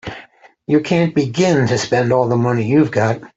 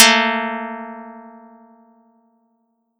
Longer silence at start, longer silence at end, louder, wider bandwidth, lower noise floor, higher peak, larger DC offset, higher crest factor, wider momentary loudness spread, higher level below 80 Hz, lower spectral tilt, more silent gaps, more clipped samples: about the same, 0.05 s vs 0 s; second, 0.1 s vs 1.7 s; about the same, -16 LUFS vs -18 LUFS; second, 8 kHz vs over 20 kHz; second, -43 dBFS vs -67 dBFS; about the same, -2 dBFS vs 0 dBFS; neither; second, 14 dB vs 22 dB; second, 6 LU vs 25 LU; first, -52 dBFS vs -78 dBFS; first, -6.5 dB/octave vs -0.5 dB/octave; neither; neither